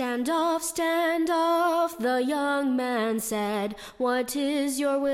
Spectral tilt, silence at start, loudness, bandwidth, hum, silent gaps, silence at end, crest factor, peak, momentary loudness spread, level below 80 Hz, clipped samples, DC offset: -3.5 dB/octave; 0 s; -26 LUFS; 16.5 kHz; none; none; 0 s; 12 dB; -14 dBFS; 4 LU; -62 dBFS; under 0.1%; under 0.1%